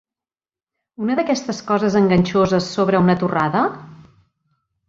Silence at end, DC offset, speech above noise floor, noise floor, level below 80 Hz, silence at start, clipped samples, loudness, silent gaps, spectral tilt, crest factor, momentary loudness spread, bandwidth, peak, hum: 0.95 s; under 0.1%; over 73 dB; under -90 dBFS; -52 dBFS; 1 s; under 0.1%; -18 LUFS; none; -6.5 dB/octave; 16 dB; 7 LU; 7.6 kHz; -2 dBFS; none